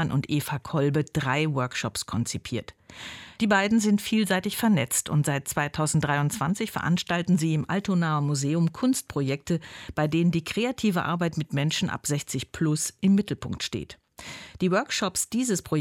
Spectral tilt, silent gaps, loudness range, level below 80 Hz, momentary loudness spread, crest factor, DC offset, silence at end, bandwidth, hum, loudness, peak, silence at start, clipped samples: -5 dB/octave; none; 3 LU; -56 dBFS; 9 LU; 16 dB; under 0.1%; 0 s; 16.5 kHz; none; -26 LUFS; -10 dBFS; 0 s; under 0.1%